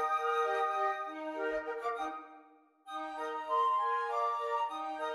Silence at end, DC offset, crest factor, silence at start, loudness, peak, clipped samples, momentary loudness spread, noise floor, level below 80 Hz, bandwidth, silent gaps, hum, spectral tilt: 0 s; under 0.1%; 14 dB; 0 s; -34 LUFS; -22 dBFS; under 0.1%; 11 LU; -61 dBFS; -74 dBFS; 14.5 kHz; none; none; -2 dB/octave